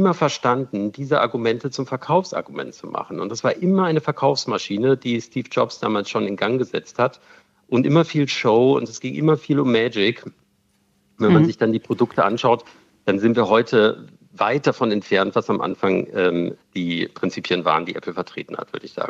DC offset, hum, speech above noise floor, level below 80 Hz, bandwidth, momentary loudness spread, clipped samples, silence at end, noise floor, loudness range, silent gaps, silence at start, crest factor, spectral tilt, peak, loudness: under 0.1%; none; 44 dB; -68 dBFS; 8 kHz; 11 LU; under 0.1%; 0 s; -64 dBFS; 3 LU; none; 0 s; 18 dB; -6 dB/octave; -2 dBFS; -20 LUFS